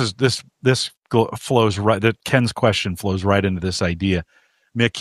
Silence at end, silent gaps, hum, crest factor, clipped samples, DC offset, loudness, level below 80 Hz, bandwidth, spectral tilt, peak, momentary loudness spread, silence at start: 0 s; 0.98-1.02 s; none; 18 dB; under 0.1%; under 0.1%; -20 LUFS; -46 dBFS; 15 kHz; -5.5 dB/octave; -2 dBFS; 4 LU; 0 s